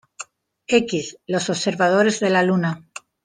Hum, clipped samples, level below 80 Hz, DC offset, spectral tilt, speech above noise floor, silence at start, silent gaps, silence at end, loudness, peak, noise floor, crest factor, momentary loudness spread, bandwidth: none; under 0.1%; -64 dBFS; under 0.1%; -4.5 dB/octave; 22 dB; 0.2 s; none; 0.45 s; -20 LUFS; -2 dBFS; -41 dBFS; 20 dB; 20 LU; 10 kHz